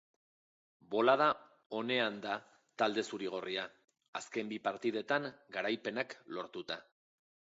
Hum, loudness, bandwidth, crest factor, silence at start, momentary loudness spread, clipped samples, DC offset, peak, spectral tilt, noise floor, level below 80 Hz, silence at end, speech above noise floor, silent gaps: none; -36 LUFS; 7.6 kHz; 24 dB; 0.9 s; 14 LU; under 0.1%; under 0.1%; -14 dBFS; -2 dB/octave; under -90 dBFS; -84 dBFS; 0.75 s; over 54 dB; 1.66-1.70 s, 4.08-4.13 s